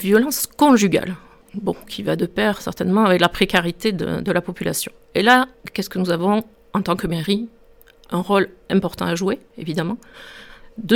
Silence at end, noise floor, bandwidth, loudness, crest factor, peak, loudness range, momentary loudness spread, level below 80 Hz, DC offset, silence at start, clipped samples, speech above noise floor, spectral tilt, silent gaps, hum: 0 s; -49 dBFS; 18.5 kHz; -20 LUFS; 18 dB; -2 dBFS; 4 LU; 13 LU; -48 dBFS; under 0.1%; 0 s; under 0.1%; 30 dB; -5 dB/octave; none; none